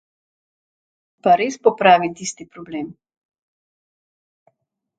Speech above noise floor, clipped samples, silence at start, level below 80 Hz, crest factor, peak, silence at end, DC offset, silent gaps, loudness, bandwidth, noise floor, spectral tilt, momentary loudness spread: 53 dB; under 0.1%; 1.25 s; -66 dBFS; 22 dB; 0 dBFS; 2.05 s; under 0.1%; none; -17 LUFS; 9.2 kHz; -71 dBFS; -4 dB/octave; 18 LU